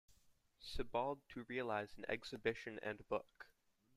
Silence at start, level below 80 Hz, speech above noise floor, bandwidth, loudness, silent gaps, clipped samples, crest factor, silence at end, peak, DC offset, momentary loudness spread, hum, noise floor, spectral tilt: 0.1 s; -60 dBFS; 32 dB; 15 kHz; -45 LUFS; none; under 0.1%; 22 dB; 0.5 s; -24 dBFS; under 0.1%; 15 LU; none; -76 dBFS; -5 dB/octave